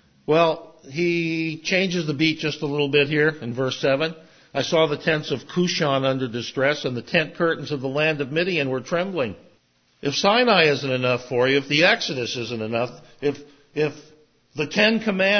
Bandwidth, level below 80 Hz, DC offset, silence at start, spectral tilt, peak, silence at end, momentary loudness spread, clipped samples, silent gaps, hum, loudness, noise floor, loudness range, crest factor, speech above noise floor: 6.6 kHz; -64 dBFS; under 0.1%; 0.3 s; -5 dB/octave; -2 dBFS; 0 s; 10 LU; under 0.1%; none; none; -22 LUFS; -62 dBFS; 4 LU; 20 dB; 40 dB